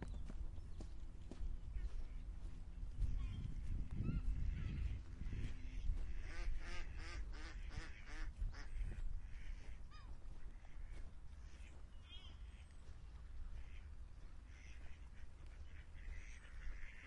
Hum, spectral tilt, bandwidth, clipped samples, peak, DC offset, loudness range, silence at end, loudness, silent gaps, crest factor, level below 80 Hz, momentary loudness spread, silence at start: none; -6 dB/octave; 9.8 kHz; under 0.1%; -28 dBFS; under 0.1%; 11 LU; 0 s; -53 LUFS; none; 18 dB; -48 dBFS; 13 LU; 0 s